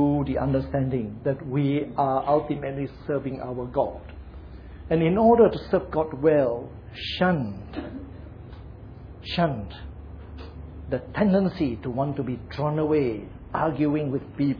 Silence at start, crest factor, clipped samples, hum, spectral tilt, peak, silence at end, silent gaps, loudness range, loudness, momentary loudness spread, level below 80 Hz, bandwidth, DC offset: 0 s; 18 dB; under 0.1%; none; -9.5 dB/octave; -6 dBFS; 0 s; none; 7 LU; -25 LUFS; 21 LU; -44 dBFS; 5.4 kHz; under 0.1%